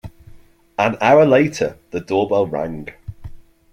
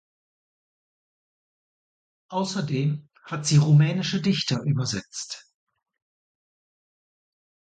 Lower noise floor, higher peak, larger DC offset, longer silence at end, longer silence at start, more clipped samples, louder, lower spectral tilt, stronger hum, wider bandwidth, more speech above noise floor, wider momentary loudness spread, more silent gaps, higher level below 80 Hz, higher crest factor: second, -44 dBFS vs under -90 dBFS; first, -2 dBFS vs -8 dBFS; neither; second, 0.3 s vs 2.25 s; second, 0.05 s vs 2.3 s; neither; first, -17 LUFS vs -24 LUFS; about the same, -6 dB/octave vs -5.5 dB/octave; neither; first, 14 kHz vs 9.2 kHz; second, 28 dB vs over 67 dB; first, 21 LU vs 16 LU; neither; first, -46 dBFS vs -64 dBFS; about the same, 18 dB vs 18 dB